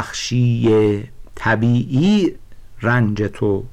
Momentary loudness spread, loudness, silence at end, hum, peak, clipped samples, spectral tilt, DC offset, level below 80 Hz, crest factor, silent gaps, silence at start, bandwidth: 9 LU; -18 LUFS; 0 s; none; -8 dBFS; under 0.1%; -6.5 dB/octave; under 0.1%; -40 dBFS; 10 dB; none; 0 s; 9.2 kHz